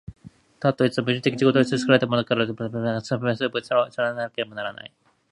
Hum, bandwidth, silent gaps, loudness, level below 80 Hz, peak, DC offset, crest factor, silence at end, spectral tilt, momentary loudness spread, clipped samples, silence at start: none; 11 kHz; none; -23 LUFS; -60 dBFS; -2 dBFS; under 0.1%; 20 dB; 0.45 s; -6 dB/octave; 10 LU; under 0.1%; 0.1 s